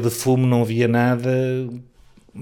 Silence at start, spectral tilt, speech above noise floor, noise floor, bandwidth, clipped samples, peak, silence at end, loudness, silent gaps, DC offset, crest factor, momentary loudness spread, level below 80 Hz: 0 s; -6.5 dB/octave; 26 dB; -45 dBFS; 18.5 kHz; under 0.1%; -8 dBFS; 0 s; -19 LUFS; none; under 0.1%; 12 dB; 11 LU; -56 dBFS